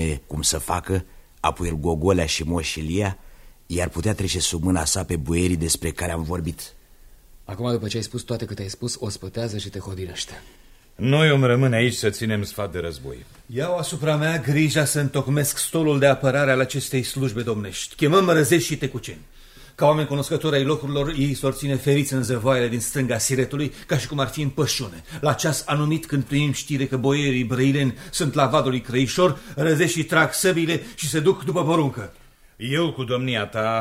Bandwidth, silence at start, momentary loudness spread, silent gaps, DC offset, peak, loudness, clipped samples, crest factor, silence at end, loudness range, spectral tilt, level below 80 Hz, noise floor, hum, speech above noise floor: 16 kHz; 0 s; 11 LU; none; under 0.1%; -2 dBFS; -22 LUFS; under 0.1%; 20 dB; 0 s; 5 LU; -5 dB/octave; -42 dBFS; -48 dBFS; none; 26 dB